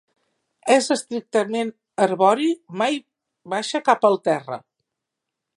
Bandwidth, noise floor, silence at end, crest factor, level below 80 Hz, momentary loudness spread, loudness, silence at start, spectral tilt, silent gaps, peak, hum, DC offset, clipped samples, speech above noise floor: 11.5 kHz; -83 dBFS; 0.95 s; 20 dB; -78 dBFS; 11 LU; -21 LUFS; 0.65 s; -4 dB/octave; none; -2 dBFS; none; under 0.1%; under 0.1%; 63 dB